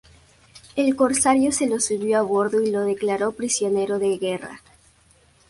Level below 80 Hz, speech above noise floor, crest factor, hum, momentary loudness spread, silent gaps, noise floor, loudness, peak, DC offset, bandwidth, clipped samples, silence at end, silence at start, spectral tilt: -58 dBFS; 36 dB; 16 dB; none; 8 LU; none; -57 dBFS; -21 LUFS; -6 dBFS; under 0.1%; 11.5 kHz; under 0.1%; 0.9 s; 0.55 s; -3.5 dB/octave